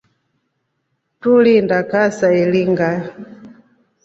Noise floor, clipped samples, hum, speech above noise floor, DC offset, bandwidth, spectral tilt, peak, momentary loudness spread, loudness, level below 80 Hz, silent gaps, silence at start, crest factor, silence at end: -70 dBFS; under 0.1%; none; 56 dB; under 0.1%; 8 kHz; -7 dB/octave; -2 dBFS; 13 LU; -15 LUFS; -60 dBFS; none; 1.25 s; 14 dB; 0.55 s